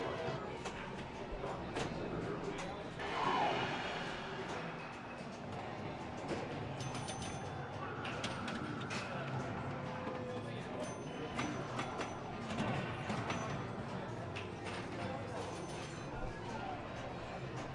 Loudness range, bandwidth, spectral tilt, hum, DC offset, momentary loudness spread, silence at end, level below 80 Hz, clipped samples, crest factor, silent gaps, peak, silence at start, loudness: 4 LU; 11.5 kHz; -5 dB/octave; none; under 0.1%; 6 LU; 0 s; -60 dBFS; under 0.1%; 18 dB; none; -22 dBFS; 0 s; -42 LUFS